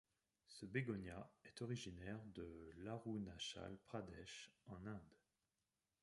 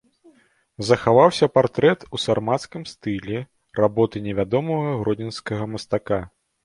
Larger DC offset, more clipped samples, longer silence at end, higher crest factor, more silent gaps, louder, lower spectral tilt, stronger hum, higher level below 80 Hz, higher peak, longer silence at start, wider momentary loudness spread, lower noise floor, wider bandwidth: neither; neither; first, 0.9 s vs 0.35 s; about the same, 22 dB vs 20 dB; neither; second, -52 LUFS vs -22 LUFS; about the same, -5.5 dB/octave vs -6 dB/octave; neither; second, -72 dBFS vs -52 dBFS; second, -30 dBFS vs -2 dBFS; second, 0.5 s vs 0.8 s; second, 11 LU vs 14 LU; first, under -90 dBFS vs -58 dBFS; about the same, 11.5 kHz vs 11.5 kHz